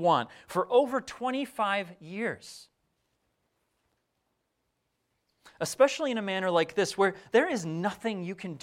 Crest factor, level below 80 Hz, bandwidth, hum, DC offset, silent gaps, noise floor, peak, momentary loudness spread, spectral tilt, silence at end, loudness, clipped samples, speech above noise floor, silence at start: 22 dB; -72 dBFS; 16 kHz; none; under 0.1%; none; -79 dBFS; -10 dBFS; 11 LU; -4.5 dB/octave; 0.05 s; -29 LUFS; under 0.1%; 50 dB; 0 s